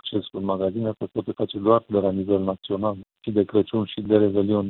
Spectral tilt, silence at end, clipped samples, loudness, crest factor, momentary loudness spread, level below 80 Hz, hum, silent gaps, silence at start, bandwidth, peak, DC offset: -11.5 dB/octave; 0 s; under 0.1%; -24 LUFS; 18 dB; 8 LU; -60 dBFS; none; none; 0.05 s; 4.2 kHz; -4 dBFS; under 0.1%